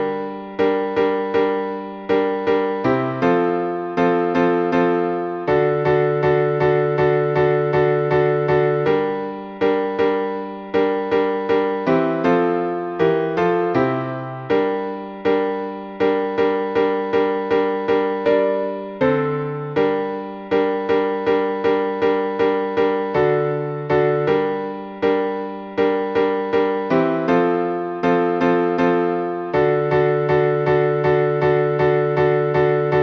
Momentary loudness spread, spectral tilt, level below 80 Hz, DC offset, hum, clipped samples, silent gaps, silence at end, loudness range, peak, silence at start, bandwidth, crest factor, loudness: 6 LU; -8.5 dB/octave; -52 dBFS; under 0.1%; none; under 0.1%; none; 0 s; 3 LU; -4 dBFS; 0 s; 6.2 kHz; 14 dB; -19 LUFS